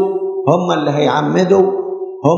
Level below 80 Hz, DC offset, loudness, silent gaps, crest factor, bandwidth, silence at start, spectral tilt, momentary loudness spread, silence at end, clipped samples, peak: -66 dBFS; under 0.1%; -15 LUFS; none; 14 dB; 7.4 kHz; 0 s; -7 dB/octave; 6 LU; 0 s; under 0.1%; 0 dBFS